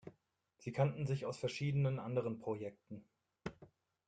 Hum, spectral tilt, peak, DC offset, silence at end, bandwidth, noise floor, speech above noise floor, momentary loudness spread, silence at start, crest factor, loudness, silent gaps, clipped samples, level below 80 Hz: none; -7.5 dB/octave; -20 dBFS; under 0.1%; 0.4 s; 9 kHz; -78 dBFS; 39 dB; 18 LU; 0.05 s; 20 dB; -39 LUFS; none; under 0.1%; -72 dBFS